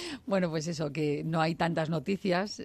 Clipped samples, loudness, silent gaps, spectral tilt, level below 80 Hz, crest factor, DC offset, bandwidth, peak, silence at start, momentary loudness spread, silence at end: under 0.1%; -31 LUFS; none; -6 dB/octave; -64 dBFS; 16 dB; under 0.1%; 12.5 kHz; -14 dBFS; 0 s; 3 LU; 0 s